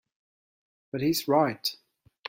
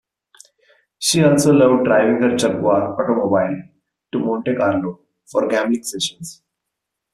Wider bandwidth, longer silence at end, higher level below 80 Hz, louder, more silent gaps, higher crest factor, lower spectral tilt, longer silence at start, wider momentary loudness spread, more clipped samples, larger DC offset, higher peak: first, 16.5 kHz vs 14.5 kHz; second, 0.55 s vs 0.8 s; second, -70 dBFS vs -58 dBFS; second, -27 LUFS vs -17 LUFS; neither; about the same, 20 dB vs 16 dB; about the same, -4.5 dB/octave vs -5 dB/octave; about the same, 0.95 s vs 1 s; about the same, 9 LU vs 11 LU; neither; neither; second, -10 dBFS vs -2 dBFS